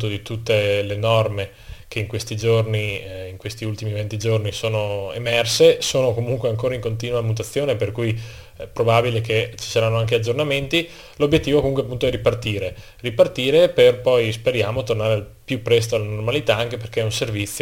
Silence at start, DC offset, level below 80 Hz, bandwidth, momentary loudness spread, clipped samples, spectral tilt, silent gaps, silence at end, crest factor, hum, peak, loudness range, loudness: 0 s; under 0.1%; -44 dBFS; 17 kHz; 12 LU; under 0.1%; -5 dB/octave; none; 0 s; 18 dB; none; -2 dBFS; 5 LU; -20 LUFS